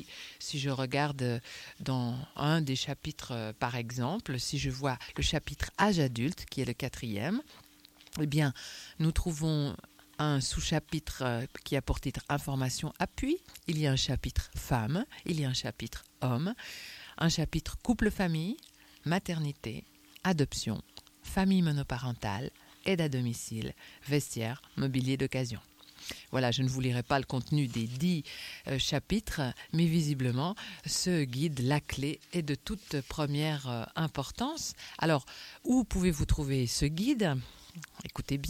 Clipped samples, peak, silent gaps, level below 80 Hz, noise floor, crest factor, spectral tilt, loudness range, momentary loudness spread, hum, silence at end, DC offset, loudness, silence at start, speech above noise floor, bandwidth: under 0.1%; -12 dBFS; none; -46 dBFS; -58 dBFS; 20 dB; -5 dB/octave; 3 LU; 11 LU; none; 0 s; under 0.1%; -33 LUFS; 0 s; 26 dB; 17 kHz